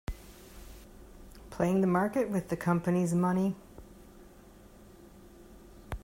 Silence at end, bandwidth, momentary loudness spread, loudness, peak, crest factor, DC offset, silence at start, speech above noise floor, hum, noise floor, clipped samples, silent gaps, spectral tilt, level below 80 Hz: 0 s; 16 kHz; 25 LU; -29 LUFS; -14 dBFS; 18 dB; under 0.1%; 0.1 s; 26 dB; none; -54 dBFS; under 0.1%; none; -7.5 dB/octave; -52 dBFS